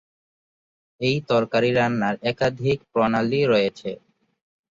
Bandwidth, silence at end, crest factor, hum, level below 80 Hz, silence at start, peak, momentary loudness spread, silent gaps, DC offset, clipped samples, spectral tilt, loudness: 7.6 kHz; 0.85 s; 16 dB; none; -56 dBFS; 1 s; -6 dBFS; 7 LU; none; under 0.1%; under 0.1%; -6.5 dB/octave; -22 LUFS